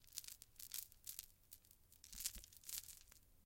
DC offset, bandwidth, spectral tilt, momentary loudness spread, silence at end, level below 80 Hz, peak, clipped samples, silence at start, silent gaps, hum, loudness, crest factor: under 0.1%; 17 kHz; 1 dB/octave; 15 LU; 0 s; -70 dBFS; -20 dBFS; under 0.1%; 0 s; none; none; -52 LUFS; 36 dB